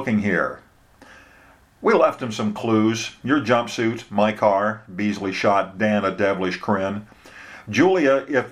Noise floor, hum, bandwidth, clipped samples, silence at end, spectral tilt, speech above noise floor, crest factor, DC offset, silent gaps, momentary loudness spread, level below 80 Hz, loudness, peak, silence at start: -52 dBFS; none; 14 kHz; under 0.1%; 0 s; -5.5 dB/octave; 32 dB; 20 dB; under 0.1%; none; 8 LU; -60 dBFS; -21 LUFS; -2 dBFS; 0 s